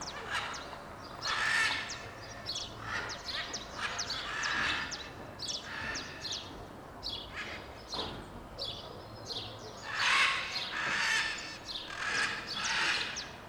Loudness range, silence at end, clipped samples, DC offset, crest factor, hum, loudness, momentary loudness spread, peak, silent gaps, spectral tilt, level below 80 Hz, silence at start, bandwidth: 9 LU; 0 s; under 0.1%; under 0.1%; 22 dB; none; -34 LUFS; 15 LU; -16 dBFS; none; -1 dB/octave; -58 dBFS; 0 s; over 20 kHz